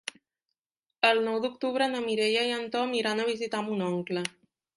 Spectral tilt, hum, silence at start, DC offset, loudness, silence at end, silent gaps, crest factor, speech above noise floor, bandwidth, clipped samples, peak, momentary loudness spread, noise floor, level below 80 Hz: -4 dB/octave; none; 0.05 s; under 0.1%; -28 LUFS; 0.45 s; 0.59-0.70 s, 0.79-0.83 s; 22 dB; 60 dB; 11.5 kHz; under 0.1%; -8 dBFS; 8 LU; -89 dBFS; -76 dBFS